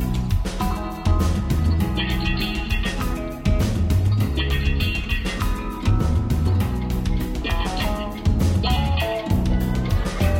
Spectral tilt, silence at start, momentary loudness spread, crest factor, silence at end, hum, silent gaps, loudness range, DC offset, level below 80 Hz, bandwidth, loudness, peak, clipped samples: -6 dB/octave; 0 s; 5 LU; 14 dB; 0 s; none; none; 1 LU; under 0.1%; -26 dBFS; 16.5 kHz; -23 LUFS; -8 dBFS; under 0.1%